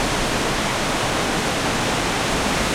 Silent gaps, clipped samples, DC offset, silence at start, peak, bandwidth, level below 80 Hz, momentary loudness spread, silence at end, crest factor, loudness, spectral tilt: none; under 0.1%; under 0.1%; 0 s; -8 dBFS; 16.5 kHz; -34 dBFS; 1 LU; 0 s; 14 dB; -21 LUFS; -3 dB/octave